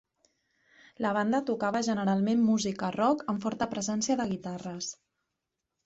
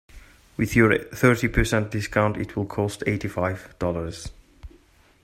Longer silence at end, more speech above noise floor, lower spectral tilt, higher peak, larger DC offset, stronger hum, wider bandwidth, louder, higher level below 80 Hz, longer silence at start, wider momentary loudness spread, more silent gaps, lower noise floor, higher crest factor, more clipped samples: first, 0.95 s vs 0.55 s; first, 56 dB vs 33 dB; about the same, -5 dB/octave vs -6 dB/octave; second, -14 dBFS vs -2 dBFS; neither; neither; second, 8 kHz vs 16 kHz; second, -29 LUFS vs -24 LUFS; second, -68 dBFS vs -38 dBFS; first, 1 s vs 0.15 s; about the same, 10 LU vs 11 LU; neither; first, -85 dBFS vs -56 dBFS; second, 16 dB vs 22 dB; neither